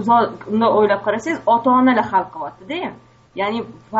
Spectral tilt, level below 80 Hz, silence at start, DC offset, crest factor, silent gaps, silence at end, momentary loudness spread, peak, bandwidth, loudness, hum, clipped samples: -4 dB/octave; -58 dBFS; 0 s; under 0.1%; 14 dB; none; 0 s; 14 LU; -4 dBFS; 8 kHz; -18 LUFS; none; under 0.1%